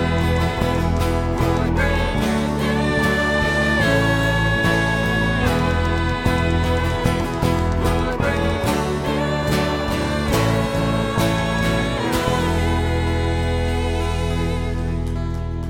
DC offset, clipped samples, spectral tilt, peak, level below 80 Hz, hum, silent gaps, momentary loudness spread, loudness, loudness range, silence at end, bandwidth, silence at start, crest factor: under 0.1%; under 0.1%; -6 dB/octave; -4 dBFS; -28 dBFS; none; none; 4 LU; -20 LUFS; 2 LU; 0 s; 17 kHz; 0 s; 14 dB